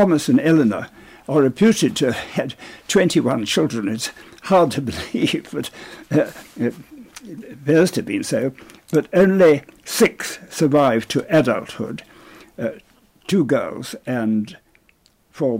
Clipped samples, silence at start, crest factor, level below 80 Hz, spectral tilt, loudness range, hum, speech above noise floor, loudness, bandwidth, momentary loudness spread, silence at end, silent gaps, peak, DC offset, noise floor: under 0.1%; 0 s; 14 dB; -54 dBFS; -5.5 dB/octave; 6 LU; none; 40 dB; -19 LUFS; 16 kHz; 15 LU; 0 s; none; -6 dBFS; under 0.1%; -58 dBFS